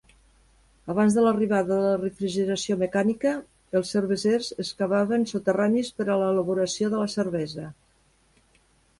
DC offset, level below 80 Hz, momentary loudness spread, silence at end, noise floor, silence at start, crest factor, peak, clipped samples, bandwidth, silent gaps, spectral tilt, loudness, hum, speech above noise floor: under 0.1%; -62 dBFS; 9 LU; 1.3 s; -63 dBFS; 0.85 s; 16 dB; -10 dBFS; under 0.1%; 11.5 kHz; none; -5.5 dB/octave; -25 LUFS; none; 39 dB